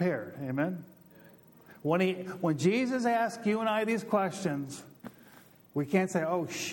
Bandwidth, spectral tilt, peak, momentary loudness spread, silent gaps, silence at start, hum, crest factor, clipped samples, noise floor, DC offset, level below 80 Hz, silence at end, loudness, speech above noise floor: 18 kHz; -6 dB/octave; -12 dBFS; 13 LU; none; 0 s; none; 20 dB; under 0.1%; -57 dBFS; under 0.1%; -76 dBFS; 0 s; -31 LUFS; 27 dB